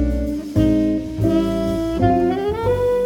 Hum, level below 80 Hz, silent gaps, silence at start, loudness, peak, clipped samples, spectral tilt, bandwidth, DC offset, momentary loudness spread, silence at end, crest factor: none; -30 dBFS; none; 0 s; -19 LUFS; -4 dBFS; under 0.1%; -8 dB/octave; 17 kHz; under 0.1%; 5 LU; 0 s; 14 dB